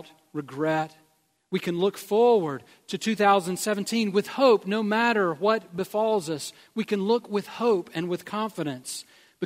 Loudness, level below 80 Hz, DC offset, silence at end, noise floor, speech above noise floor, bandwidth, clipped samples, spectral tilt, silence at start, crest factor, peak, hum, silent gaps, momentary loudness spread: -25 LUFS; -76 dBFS; under 0.1%; 0 s; -53 dBFS; 28 dB; 16 kHz; under 0.1%; -5 dB/octave; 0.35 s; 18 dB; -8 dBFS; none; none; 14 LU